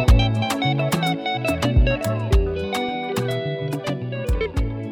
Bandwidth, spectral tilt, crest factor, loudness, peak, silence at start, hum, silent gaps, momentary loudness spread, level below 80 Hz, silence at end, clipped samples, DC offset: 17.5 kHz; -6 dB/octave; 16 dB; -22 LUFS; -4 dBFS; 0 s; none; none; 7 LU; -24 dBFS; 0 s; under 0.1%; under 0.1%